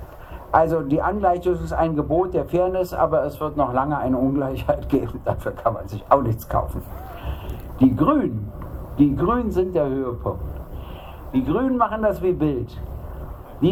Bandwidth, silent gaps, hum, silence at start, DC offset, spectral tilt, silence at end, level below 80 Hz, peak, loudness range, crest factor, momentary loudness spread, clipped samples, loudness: 16.5 kHz; none; none; 0 s; under 0.1%; -8.5 dB/octave; 0 s; -36 dBFS; 0 dBFS; 3 LU; 22 dB; 16 LU; under 0.1%; -22 LUFS